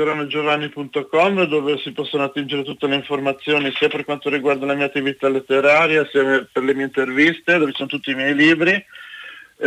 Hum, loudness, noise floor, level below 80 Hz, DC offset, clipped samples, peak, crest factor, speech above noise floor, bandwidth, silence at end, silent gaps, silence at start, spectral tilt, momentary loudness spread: none; -18 LUFS; -38 dBFS; -64 dBFS; under 0.1%; under 0.1%; -4 dBFS; 14 dB; 20 dB; 12 kHz; 0 s; none; 0 s; -5.5 dB/octave; 10 LU